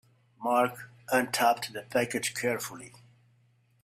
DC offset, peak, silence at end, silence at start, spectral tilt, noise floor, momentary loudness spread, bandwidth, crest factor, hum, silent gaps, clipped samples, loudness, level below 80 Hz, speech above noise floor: under 0.1%; -10 dBFS; 0.95 s; 0.4 s; -3 dB/octave; -67 dBFS; 15 LU; 16 kHz; 20 dB; none; none; under 0.1%; -29 LUFS; -72 dBFS; 37 dB